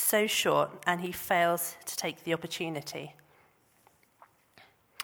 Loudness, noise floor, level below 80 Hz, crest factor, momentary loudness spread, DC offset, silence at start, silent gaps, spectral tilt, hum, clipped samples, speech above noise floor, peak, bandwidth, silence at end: -30 LUFS; -66 dBFS; -72 dBFS; 22 dB; 12 LU; under 0.1%; 0 s; none; -2.5 dB/octave; none; under 0.1%; 35 dB; -10 dBFS; over 20 kHz; 0 s